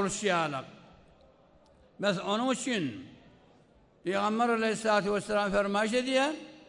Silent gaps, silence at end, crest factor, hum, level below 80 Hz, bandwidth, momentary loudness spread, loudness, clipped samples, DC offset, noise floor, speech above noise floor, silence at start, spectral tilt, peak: none; 0.1 s; 16 dB; none; -62 dBFS; 11 kHz; 9 LU; -29 LUFS; under 0.1%; under 0.1%; -62 dBFS; 32 dB; 0 s; -4 dB/octave; -14 dBFS